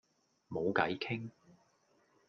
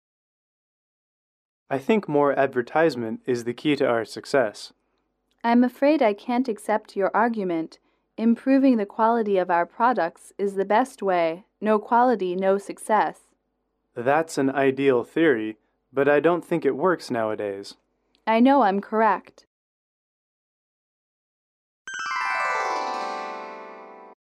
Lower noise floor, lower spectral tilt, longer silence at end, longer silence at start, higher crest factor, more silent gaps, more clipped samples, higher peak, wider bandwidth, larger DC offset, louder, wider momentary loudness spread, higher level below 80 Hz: about the same, -72 dBFS vs -75 dBFS; about the same, -7 dB/octave vs -6 dB/octave; first, 1 s vs 0.25 s; second, 0.5 s vs 1.7 s; first, 26 dB vs 16 dB; second, none vs 19.47-21.85 s; neither; second, -14 dBFS vs -8 dBFS; second, 7 kHz vs 13.5 kHz; neither; second, -36 LUFS vs -23 LUFS; about the same, 12 LU vs 12 LU; about the same, -74 dBFS vs -74 dBFS